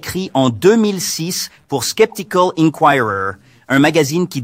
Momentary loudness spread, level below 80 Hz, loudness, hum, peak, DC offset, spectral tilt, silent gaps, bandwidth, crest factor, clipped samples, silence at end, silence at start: 9 LU; -54 dBFS; -15 LUFS; none; 0 dBFS; under 0.1%; -4.5 dB/octave; none; 16 kHz; 16 dB; under 0.1%; 0 s; 0.05 s